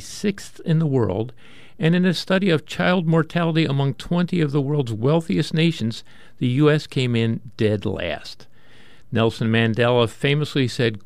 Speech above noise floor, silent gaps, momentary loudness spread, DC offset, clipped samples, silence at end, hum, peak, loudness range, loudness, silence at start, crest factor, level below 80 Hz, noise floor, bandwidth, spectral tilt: 31 dB; none; 9 LU; 0.9%; under 0.1%; 0.05 s; none; -4 dBFS; 2 LU; -21 LUFS; 0 s; 16 dB; -52 dBFS; -51 dBFS; 12.5 kHz; -6.5 dB/octave